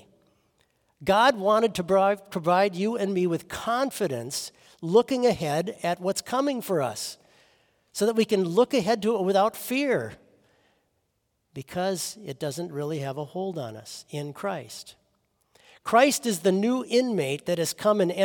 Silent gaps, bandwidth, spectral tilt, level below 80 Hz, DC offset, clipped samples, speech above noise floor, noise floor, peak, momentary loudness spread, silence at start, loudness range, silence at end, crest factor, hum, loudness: none; 18 kHz; -4.5 dB/octave; -66 dBFS; under 0.1%; under 0.1%; 50 dB; -75 dBFS; -6 dBFS; 14 LU; 1 s; 9 LU; 0 s; 20 dB; none; -25 LUFS